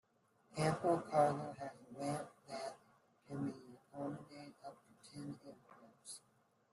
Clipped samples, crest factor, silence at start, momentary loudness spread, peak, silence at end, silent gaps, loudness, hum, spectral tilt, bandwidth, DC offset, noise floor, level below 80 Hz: under 0.1%; 22 dB; 0.5 s; 22 LU; -20 dBFS; 0.55 s; none; -41 LUFS; none; -6 dB/octave; 12.5 kHz; under 0.1%; -75 dBFS; -78 dBFS